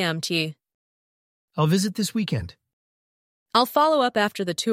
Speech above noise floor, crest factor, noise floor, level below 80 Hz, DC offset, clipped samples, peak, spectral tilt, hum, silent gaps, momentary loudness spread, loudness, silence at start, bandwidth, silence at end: over 68 dB; 22 dB; under -90 dBFS; -56 dBFS; under 0.1%; under 0.1%; -4 dBFS; -4.5 dB/octave; none; 0.74-1.48 s, 2.73-3.46 s; 11 LU; -23 LUFS; 0 s; 16 kHz; 0 s